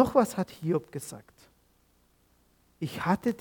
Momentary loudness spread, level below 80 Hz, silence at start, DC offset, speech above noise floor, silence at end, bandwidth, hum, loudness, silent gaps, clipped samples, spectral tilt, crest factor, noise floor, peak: 15 LU; -62 dBFS; 0 s; under 0.1%; 38 dB; 0.05 s; 19 kHz; none; -30 LUFS; none; under 0.1%; -6.5 dB/octave; 22 dB; -66 dBFS; -8 dBFS